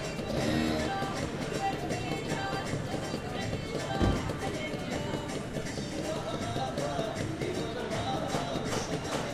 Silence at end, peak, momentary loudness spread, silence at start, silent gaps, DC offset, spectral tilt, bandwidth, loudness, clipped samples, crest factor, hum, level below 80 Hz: 0 s; -14 dBFS; 5 LU; 0 s; none; under 0.1%; -5 dB/octave; 15.5 kHz; -33 LUFS; under 0.1%; 18 dB; none; -46 dBFS